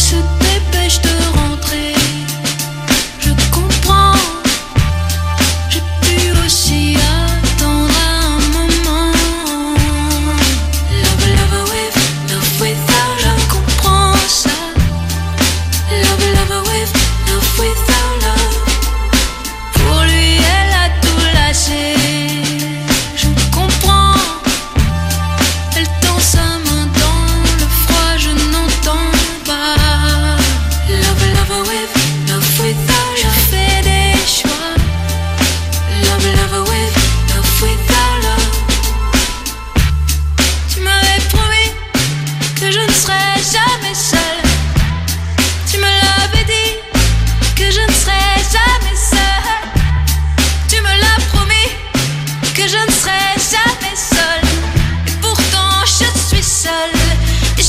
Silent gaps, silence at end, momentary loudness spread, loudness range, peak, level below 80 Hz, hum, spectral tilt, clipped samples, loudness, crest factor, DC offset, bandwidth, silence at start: none; 0 s; 5 LU; 2 LU; 0 dBFS; -16 dBFS; none; -3.5 dB/octave; under 0.1%; -12 LUFS; 12 dB; under 0.1%; 16 kHz; 0 s